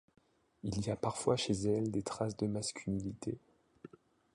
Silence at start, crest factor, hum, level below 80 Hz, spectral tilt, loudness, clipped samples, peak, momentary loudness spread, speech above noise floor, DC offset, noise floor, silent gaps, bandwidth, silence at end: 0.65 s; 20 dB; none; -60 dBFS; -5.5 dB/octave; -37 LUFS; under 0.1%; -18 dBFS; 14 LU; 22 dB; under 0.1%; -58 dBFS; none; 11.5 kHz; 0.5 s